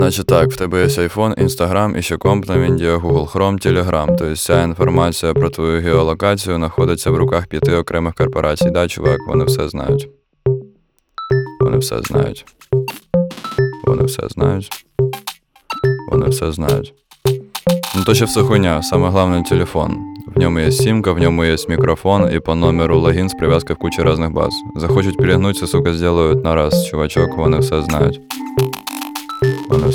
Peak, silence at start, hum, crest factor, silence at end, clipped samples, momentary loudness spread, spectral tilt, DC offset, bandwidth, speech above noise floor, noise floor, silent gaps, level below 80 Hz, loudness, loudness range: 0 dBFS; 0 s; none; 14 dB; 0 s; under 0.1%; 7 LU; -6 dB/octave; under 0.1%; 19.5 kHz; 39 dB; -54 dBFS; none; -32 dBFS; -16 LUFS; 4 LU